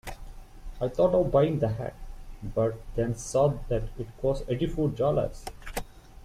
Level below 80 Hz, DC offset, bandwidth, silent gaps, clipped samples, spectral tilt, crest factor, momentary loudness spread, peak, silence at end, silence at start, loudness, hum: -40 dBFS; under 0.1%; 15.5 kHz; none; under 0.1%; -7 dB/octave; 18 dB; 19 LU; -10 dBFS; 0 s; 0.05 s; -28 LUFS; none